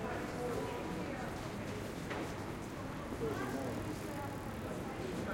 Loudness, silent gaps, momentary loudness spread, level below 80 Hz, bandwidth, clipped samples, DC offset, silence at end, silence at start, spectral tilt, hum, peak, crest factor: -41 LUFS; none; 4 LU; -56 dBFS; 17 kHz; under 0.1%; under 0.1%; 0 s; 0 s; -5.5 dB/octave; none; -28 dBFS; 14 dB